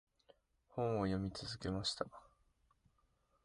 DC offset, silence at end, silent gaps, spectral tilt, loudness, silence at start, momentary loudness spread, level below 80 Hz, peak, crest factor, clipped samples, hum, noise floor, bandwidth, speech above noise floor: under 0.1%; 1.2 s; none; -5.5 dB/octave; -41 LUFS; 0.75 s; 8 LU; -62 dBFS; -22 dBFS; 22 dB; under 0.1%; none; -78 dBFS; 11 kHz; 37 dB